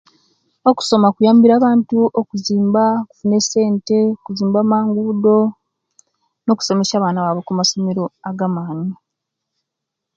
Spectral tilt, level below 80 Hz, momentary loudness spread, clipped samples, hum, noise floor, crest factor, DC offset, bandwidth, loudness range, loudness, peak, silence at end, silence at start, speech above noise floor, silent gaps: -5.5 dB/octave; -64 dBFS; 10 LU; under 0.1%; none; -80 dBFS; 16 dB; under 0.1%; 7.8 kHz; 5 LU; -16 LUFS; 0 dBFS; 1.2 s; 0.65 s; 65 dB; none